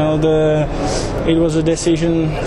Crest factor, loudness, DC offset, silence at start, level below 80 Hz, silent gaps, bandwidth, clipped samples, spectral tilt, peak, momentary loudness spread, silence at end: 12 dB; -16 LUFS; under 0.1%; 0 s; -28 dBFS; none; 11.5 kHz; under 0.1%; -6 dB/octave; -4 dBFS; 5 LU; 0 s